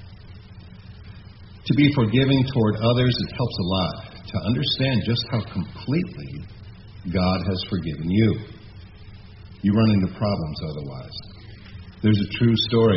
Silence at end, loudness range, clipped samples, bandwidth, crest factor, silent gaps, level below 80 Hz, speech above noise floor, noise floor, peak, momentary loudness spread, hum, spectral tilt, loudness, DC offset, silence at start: 0 s; 4 LU; under 0.1%; 6 kHz; 18 dB; none; -46 dBFS; 21 dB; -42 dBFS; -4 dBFS; 24 LU; none; -6 dB/octave; -22 LUFS; under 0.1%; 0 s